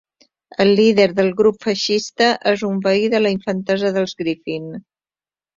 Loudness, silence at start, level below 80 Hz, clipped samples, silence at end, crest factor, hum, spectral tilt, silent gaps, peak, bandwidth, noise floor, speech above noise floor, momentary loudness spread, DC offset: -17 LUFS; 0.6 s; -60 dBFS; under 0.1%; 0.8 s; 16 dB; none; -5 dB/octave; none; -2 dBFS; 7.6 kHz; under -90 dBFS; over 73 dB; 13 LU; under 0.1%